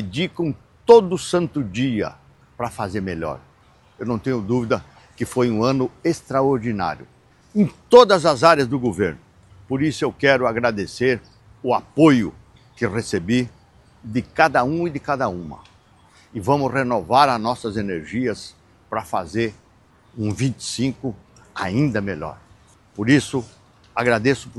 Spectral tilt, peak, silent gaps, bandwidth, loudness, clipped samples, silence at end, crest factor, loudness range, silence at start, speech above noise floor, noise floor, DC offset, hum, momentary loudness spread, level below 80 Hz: -6 dB/octave; 0 dBFS; none; 12.5 kHz; -20 LUFS; under 0.1%; 0 s; 20 dB; 8 LU; 0 s; 35 dB; -54 dBFS; under 0.1%; none; 15 LU; -52 dBFS